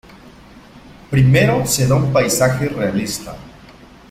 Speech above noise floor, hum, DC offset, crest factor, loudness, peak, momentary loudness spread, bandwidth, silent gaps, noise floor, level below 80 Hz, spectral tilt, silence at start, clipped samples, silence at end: 27 dB; none; under 0.1%; 16 dB; -16 LUFS; -2 dBFS; 13 LU; 16 kHz; none; -42 dBFS; -40 dBFS; -5 dB/octave; 0.25 s; under 0.1%; 0.6 s